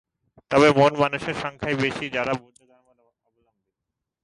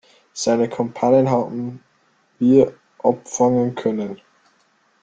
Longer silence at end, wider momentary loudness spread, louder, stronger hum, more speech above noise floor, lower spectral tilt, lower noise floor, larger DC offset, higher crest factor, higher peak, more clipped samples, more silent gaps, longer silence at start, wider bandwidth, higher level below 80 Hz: first, 1.85 s vs 0.85 s; about the same, 12 LU vs 14 LU; second, -22 LUFS vs -19 LUFS; neither; first, 63 dB vs 43 dB; about the same, -5.5 dB/octave vs -6 dB/octave; first, -84 dBFS vs -61 dBFS; neither; about the same, 18 dB vs 18 dB; second, -6 dBFS vs -2 dBFS; neither; neither; first, 0.5 s vs 0.35 s; first, 11.5 kHz vs 9.2 kHz; about the same, -56 dBFS vs -60 dBFS